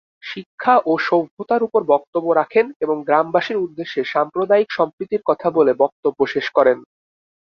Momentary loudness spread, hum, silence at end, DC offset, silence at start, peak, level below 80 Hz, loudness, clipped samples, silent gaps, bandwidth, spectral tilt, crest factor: 7 LU; none; 0.75 s; under 0.1%; 0.25 s; -2 dBFS; -64 dBFS; -18 LUFS; under 0.1%; 0.46-0.58 s, 1.31-1.37 s, 2.07-2.13 s, 2.76-2.80 s, 4.93-4.98 s, 5.92-6.03 s; 6.6 kHz; -6.5 dB/octave; 16 dB